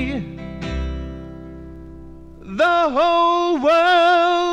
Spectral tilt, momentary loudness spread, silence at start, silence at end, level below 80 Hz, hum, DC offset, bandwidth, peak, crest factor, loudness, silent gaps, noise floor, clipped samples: -5.5 dB/octave; 23 LU; 0 s; 0 s; -36 dBFS; none; under 0.1%; 9.4 kHz; -6 dBFS; 14 dB; -17 LUFS; none; -38 dBFS; under 0.1%